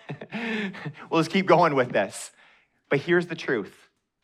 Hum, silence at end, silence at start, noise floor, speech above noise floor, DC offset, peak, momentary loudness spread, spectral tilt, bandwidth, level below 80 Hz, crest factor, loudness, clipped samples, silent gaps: none; 0.55 s; 0.1 s; -60 dBFS; 35 dB; under 0.1%; -6 dBFS; 18 LU; -5.5 dB/octave; 14 kHz; -74 dBFS; 20 dB; -25 LUFS; under 0.1%; none